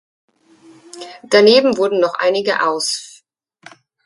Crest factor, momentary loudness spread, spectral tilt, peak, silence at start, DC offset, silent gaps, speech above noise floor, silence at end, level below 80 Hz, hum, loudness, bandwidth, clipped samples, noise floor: 18 dB; 22 LU; -3 dB/octave; 0 dBFS; 0.95 s; under 0.1%; none; 41 dB; 1 s; -66 dBFS; none; -15 LUFS; 11.5 kHz; under 0.1%; -55 dBFS